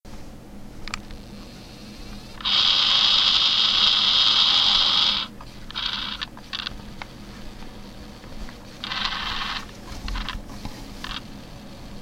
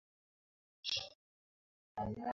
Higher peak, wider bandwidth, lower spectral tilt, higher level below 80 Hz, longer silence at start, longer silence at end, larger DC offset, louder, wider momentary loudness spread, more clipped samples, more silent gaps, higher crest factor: first, -4 dBFS vs -24 dBFS; first, 16.5 kHz vs 7.4 kHz; about the same, -1.5 dB/octave vs -2.5 dB/octave; first, -40 dBFS vs -66 dBFS; second, 0.05 s vs 0.85 s; about the same, 0 s vs 0 s; neither; first, -18 LUFS vs -42 LUFS; first, 26 LU vs 12 LU; neither; second, none vs 1.15-1.95 s; about the same, 22 dB vs 22 dB